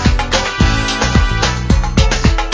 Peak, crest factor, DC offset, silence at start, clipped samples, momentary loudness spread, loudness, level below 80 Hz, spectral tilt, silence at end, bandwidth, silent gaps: 0 dBFS; 12 dB; under 0.1%; 0 s; under 0.1%; 2 LU; -14 LUFS; -16 dBFS; -4.5 dB/octave; 0 s; 8 kHz; none